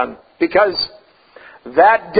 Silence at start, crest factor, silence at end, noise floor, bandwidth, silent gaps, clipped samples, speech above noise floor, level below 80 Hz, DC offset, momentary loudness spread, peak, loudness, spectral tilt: 0 s; 16 dB; 0 s; -44 dBFS; 5 kHz; none; under 0.1%; 29 dB; -54 dBFS; under 0.1%; 12 LU; 0 dBFS; -16 LUFS; -9 dB/octave